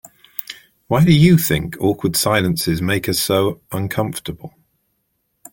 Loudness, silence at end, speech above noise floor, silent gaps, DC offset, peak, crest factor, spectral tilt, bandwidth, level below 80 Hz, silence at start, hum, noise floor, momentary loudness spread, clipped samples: -17 LUFS; 1.05 s; 53 dB; none; under 0.1%; -2 dBFS; 16 dB; -5 dB/octave; 17 kHz; -44 dBFS; 0.4 s; none; -69 dBFS; 18 LU; under 0.1%